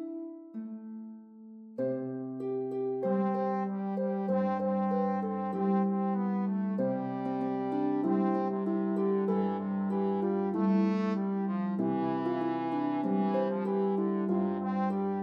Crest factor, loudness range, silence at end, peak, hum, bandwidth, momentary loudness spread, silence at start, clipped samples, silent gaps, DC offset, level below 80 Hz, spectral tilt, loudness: 12 dB; 3 LU; 0 s; -18 dBFS; none; 5.4 kHz; 9 LU; 0 s; under 0.1%; none; under 0.1%; -86 dBFS; -10.5 dB/octave; -31 LUFS